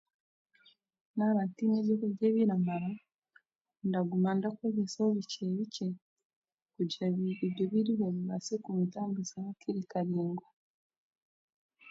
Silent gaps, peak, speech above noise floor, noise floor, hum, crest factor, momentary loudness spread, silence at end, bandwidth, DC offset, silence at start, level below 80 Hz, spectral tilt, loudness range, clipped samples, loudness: 3.14-3.22 s, 3.61-3.65 s, 6.02-6.16 s, 6.25-6.30 s, 6.36-6.42 s, 6.54-6.66 s, 10.53-10.90 s, 10.97-11.69 s; -18 dBFS; 37 dB; -69 dBFS; none; 16 dB; 9 LU; 0 s; 7.8 kHz; under 0.1%; 1.15 s; -80 dBFS; -7 dB/octave; 4 LU; under 0.1%; -33 LUFS